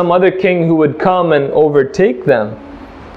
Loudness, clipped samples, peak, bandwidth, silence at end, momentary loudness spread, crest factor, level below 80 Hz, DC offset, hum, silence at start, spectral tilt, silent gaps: -12 LUFS; under 0.1%; 0 dBFS; 7.8 kHz; 0 s; 14 LU; 12 dB; -44 dBFS; under 0.1%; none; 0 s; -7.5 dB/octave; none